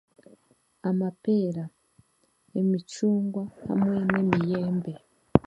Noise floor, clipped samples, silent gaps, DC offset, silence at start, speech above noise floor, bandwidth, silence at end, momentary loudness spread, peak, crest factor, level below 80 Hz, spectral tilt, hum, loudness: -67 dBFS; under 0.1%; none; under 0.1%; 0.85 s; 41 dB; 11.5 kHz; 0.05 s; 11 LU; 0 dBFS; 26 dB; -54 dBFS; -8 dB/octave; none; -27 LUFS